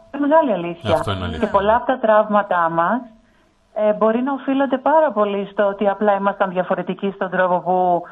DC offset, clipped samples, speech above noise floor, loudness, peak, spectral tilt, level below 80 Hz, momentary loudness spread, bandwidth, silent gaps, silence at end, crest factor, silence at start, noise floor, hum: under 0.1%; under 0.1%; 39 dB; -18 LUFS; -2 dBFS; -7.5 dB/octave; -48 dBFS; 7 LU; 11.5 kHz; none; 0 s; 16 dB; 0.15 s; -56 dBFS; none